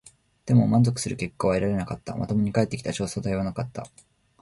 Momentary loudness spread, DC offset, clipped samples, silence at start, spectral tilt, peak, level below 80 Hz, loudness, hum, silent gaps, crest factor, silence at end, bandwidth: 13 LU; under 0.1%; under 0.1%; 0.45 s; -6.5 dB/octave; -8 dBFS; -50 dBFS; -25 LUFS; none; none; 18 dB; 0.55 s; 11.5 kHz